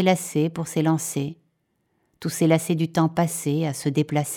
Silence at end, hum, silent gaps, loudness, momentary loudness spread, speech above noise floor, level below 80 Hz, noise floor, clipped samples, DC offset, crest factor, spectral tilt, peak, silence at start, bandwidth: 0 s; none; none; -23 LUFS; 8 LU; 49 dB; -66 dBFS; -71 dBFS; under 0.1%; under 0.1%; 18 dB; -5.5 dB/octave; -6 dBFS; 0 s; 17.5 kHz